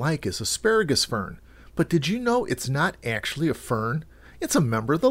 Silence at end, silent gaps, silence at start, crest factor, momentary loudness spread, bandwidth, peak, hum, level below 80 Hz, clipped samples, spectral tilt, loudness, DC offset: 0 s; none; 0 s; 16 dB; 8 LU; 16 kHz; -8 dBFS; none; -50 dBFS; under 0.1%; -4.5 dB/octave; -25 LUFS; under 0.1%